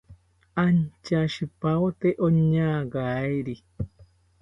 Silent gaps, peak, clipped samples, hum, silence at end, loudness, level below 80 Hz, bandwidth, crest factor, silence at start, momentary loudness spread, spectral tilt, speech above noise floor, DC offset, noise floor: none; -10 dBFS; under 0.1%; none; 0.4 s; -25 LUFS; -52 dBFS; 7.4 kHz; 16 dB; 0.1 s; 14 LU; -8.5 dB/octave; 29 dB; under 0.1%; -53 dBFS